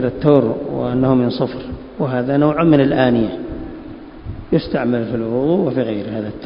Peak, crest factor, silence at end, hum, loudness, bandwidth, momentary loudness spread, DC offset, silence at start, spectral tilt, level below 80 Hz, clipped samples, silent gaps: 0 dBFS; 18 dB; 0 s; none; -17 LUFS; 5.4 kHz; 18 LU; under 0.1%; 0 s; -11 dB/octave; -40 dBFS; under 0.1%; none